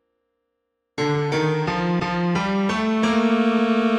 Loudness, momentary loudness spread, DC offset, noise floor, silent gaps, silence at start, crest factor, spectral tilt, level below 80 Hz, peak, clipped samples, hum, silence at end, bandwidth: -21 LUFS; 4 LU; under 0.1%; -76 dBFS; none; 0.95 s; 14 dB; -6.5 dB/octave; -52 dBFS; -8 dBFS; under 0.1%; none; 0 s; 9.8 kHz